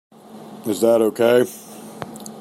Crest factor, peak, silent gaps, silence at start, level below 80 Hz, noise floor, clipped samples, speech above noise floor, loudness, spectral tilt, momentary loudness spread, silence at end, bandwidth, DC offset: 18 dB; -2 dBFS; none; 0.3 s; -68 dBFS; -39 dBFS; under 0.1%; 23 dB; -18 LUFS; -5 dB/octave; 20 LU; 0 s; 16 kHz; under 0.1%